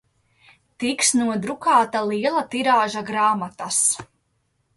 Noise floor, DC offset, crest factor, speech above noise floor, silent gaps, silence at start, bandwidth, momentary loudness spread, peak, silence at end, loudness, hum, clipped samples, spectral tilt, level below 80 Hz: -69 dBFS; under 0.1%; 18 dB; 49 dB; none; 0.8 s; 12 kHz; 7 LU; -6 dBFS; 0.7 s; -20 LUFS; none; under 0.1%; -2.5 dB/octave; -66 dBFS